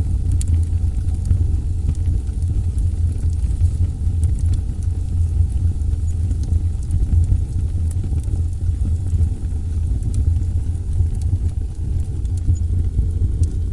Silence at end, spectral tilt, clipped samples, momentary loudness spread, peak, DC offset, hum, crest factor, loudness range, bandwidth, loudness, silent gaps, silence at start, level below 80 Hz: 0 s; -8 dB/octave; under 0.1%; 4 LU; -4 dBFS; under 0.1%; none; 14 dB; 1 LU; 11 kHz; -21 LUFS; none; 0 s; -22 dBFS